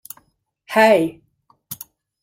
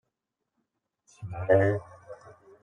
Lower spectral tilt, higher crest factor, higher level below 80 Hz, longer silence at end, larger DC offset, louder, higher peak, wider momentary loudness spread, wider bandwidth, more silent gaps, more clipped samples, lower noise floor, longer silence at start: second, -4.5 dB/octave vs -8.5 dB/octave; about the same, 20 dB vs 22 dB; about the same, -66 dBFS vs -62 dBFS; first, 0.5 s vs 0.3 s; neither; first, -16 LUFS vs -26 LUFS; first, -2 dBFS vs -10 dBFS; about the same, 25 LU vs 25 LU; first, 16.5 kHz vs 9.6 kHz; neither; neither; second, -63 dBFS vs -84 dBFS; second, 0.7 s vs 1.2 s